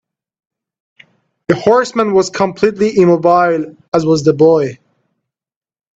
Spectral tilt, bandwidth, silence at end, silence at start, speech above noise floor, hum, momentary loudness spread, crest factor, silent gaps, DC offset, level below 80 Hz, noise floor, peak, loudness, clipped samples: -6.5 dB/octave; 8 kHz; 1.25 s; 1.5 s; over 78 dB; none; 8 LU; 14 dB; 3.88-3.92 s; under 0.1%; -54 dBFS; under -90 dBFS; 0 dBFS; -12 LUFS; under 0.1%